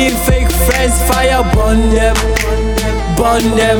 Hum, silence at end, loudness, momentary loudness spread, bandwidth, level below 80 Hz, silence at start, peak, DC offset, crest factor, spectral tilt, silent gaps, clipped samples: none; 0 s; -12 LUFS; 4 LU; 19.5 kHz; -16 dBFS; 0 s; 0 dBFS; under 0.1%; 10 dB; -4.5 dB/octave; none; under 0.1%